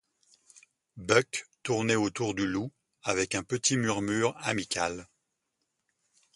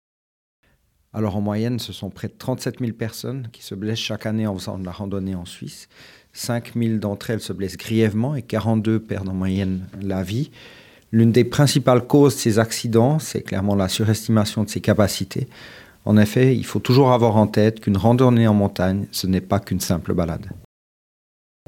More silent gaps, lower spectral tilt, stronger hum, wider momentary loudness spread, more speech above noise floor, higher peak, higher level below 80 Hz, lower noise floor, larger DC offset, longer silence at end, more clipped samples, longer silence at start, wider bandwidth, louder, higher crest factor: neither; second, -3.5 dB/octave vs -6 dB/octave; neither; second, 10 LU vs 15 LU; first, 52 dB vs 43 dB; second, -6 dBFS vs 0 dBFS; second, -62 dBFS vs -54 dBFS; first, -81 dBFS vs -63 dBFS; neither; first, 1.3 s vs 1.1 s; neither; second, 0.55 s vs 1.15 s; second, 11.5 kHz vs 17 kHz; second, -29 LUFS vs -20 LUFS; about the same, 24 dB vs 20 dB